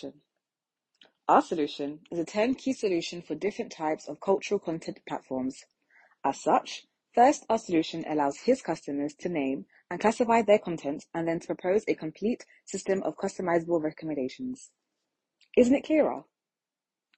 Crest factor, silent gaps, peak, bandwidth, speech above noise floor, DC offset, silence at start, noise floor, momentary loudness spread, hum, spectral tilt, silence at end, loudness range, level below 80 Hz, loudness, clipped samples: 22 dB; none; -6 dBFS; 8.4 kHz; over 62 dB; under 0.1%; 0.05 s; under -90 dBFS; 13 LU; none; -5 dB/octave; 0.95 s; 4 LU; -68 dBFS; -29 LUFS; under 0.1%